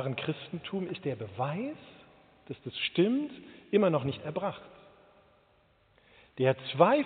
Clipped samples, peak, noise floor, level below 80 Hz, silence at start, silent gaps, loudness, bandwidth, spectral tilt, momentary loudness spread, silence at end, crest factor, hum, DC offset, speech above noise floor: under 0.1%; -8 dBFS; -66 dBFS; -72 dBFS; 0 s; none; -31 LUFS; 4.6 kHz; -5 dB/octave; 18 LU; 0 s; 24 dB; none; under 0.1%; 36 dB